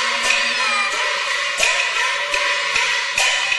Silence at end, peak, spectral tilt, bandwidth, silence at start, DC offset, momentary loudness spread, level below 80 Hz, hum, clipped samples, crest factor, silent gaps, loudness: 0 s; -2 dBFS; 2 dB/octave; 12 kHz; 0 s; under 0.1%; 3 LU; -56 dBFS; none; under 0.1%; 16 dB; none; -17 LUFS